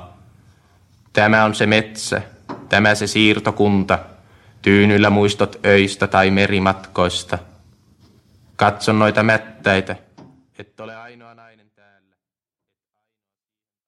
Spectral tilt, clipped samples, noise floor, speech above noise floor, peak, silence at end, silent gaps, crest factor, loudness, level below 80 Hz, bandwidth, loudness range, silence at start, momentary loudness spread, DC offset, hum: -5 dB/octave; under 0.1%; under -90 dBFS; over 74 dB; 0 dBFS; 2.8 s; none; 18 dB; -16 LUFS; -52 dBFS; 12.5 kHz; 5 LU; 0 s; 16 LU; under 0.1%; none